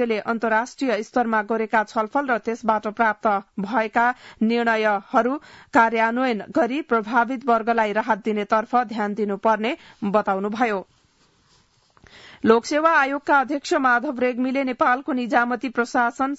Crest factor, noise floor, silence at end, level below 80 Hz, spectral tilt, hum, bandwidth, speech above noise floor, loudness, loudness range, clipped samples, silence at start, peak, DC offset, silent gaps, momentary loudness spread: 20 dB; -61 dBFS; 0 s; -62 dBFS; -5 dB/octave; none; 8 kHz; 39 dB; -21 LUFS; 3 LU; under 0.1%; 0 s; -2 dBFS; under 0.1%; none; 5 LU